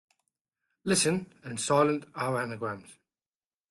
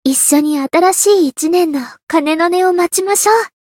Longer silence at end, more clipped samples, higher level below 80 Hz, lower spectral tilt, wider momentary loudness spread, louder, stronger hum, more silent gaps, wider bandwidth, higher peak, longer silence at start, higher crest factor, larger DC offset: first, 0.8 s vs 0.2 s; neither; about the same, -68 dBFS vs -64 dBFS; first, -4 dB/octave vs -1.5 dB/octave; first, 13 LU vs 5 LU; second, -29 LUFS vs -12 LUFS; neither; second, none vs 2.03-2.07 s; second, 12.5 kHz vs 17.5 kHz; second, -12 dBFS vs 0 dBFS; first, 0.85 s vs 0.05 s; first, 20 dB vs 12 dB; neither